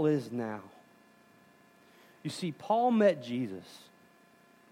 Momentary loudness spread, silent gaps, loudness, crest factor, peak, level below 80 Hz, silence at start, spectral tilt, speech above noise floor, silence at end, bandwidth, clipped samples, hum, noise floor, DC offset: 20 LU; none; -31 LUFS; 20 dB; -14 dBFS; -84 dBFS; 0 s; -6.5 dB/octave; 31 dB; 0.95 s; 16 kHz; under 0.1%; none; -62 dBFS; under 0.1%